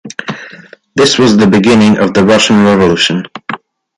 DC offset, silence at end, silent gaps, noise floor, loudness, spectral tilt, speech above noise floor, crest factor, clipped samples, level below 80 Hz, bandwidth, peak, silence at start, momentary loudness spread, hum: under 0.1%; 0.4 s; none; -35 dBFS; -8 LUFS; -5 dB/octave; 28 dB; 10 dB; under 0.1%; -42 dBFS; 11.5 kHz; 0 dBFS; 0.05 s; 16 LU; none